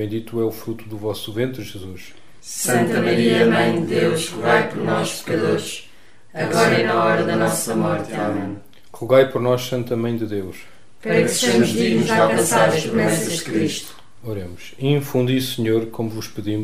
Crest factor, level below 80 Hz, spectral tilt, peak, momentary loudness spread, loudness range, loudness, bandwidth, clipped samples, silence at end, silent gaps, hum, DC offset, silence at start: 18 dB; -58 dBFS; -4.5 dB/octave; -2 dBFS; 16 LU; 4 LU; -19 LUFS; 16 kHz; under 0.1%; 0 s; none; none; 1%; 0 s